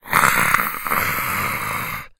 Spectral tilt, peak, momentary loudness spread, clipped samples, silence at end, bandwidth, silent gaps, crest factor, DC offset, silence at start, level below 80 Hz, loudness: -2.5 dB/octave; 0 dBFS; 9 LU; under 0.1%; 0.1 s; 19 kHz; none; 20 dB; under 0.1%; 0.05 s; -44 dBFS; -19 LUFS